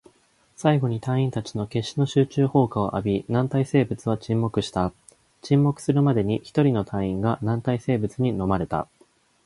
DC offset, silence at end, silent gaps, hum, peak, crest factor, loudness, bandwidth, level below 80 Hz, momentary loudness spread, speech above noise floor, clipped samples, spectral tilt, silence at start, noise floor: under 0.1%; 0.6 s; none; none; -4 dBFS; 18 dB; -24 LUFS; 11.5 kHz; -50 dBFS; 7 LU; 39 dB; under 0.1%; -7.5 dB/octave; 0.6 s; -61 dBFS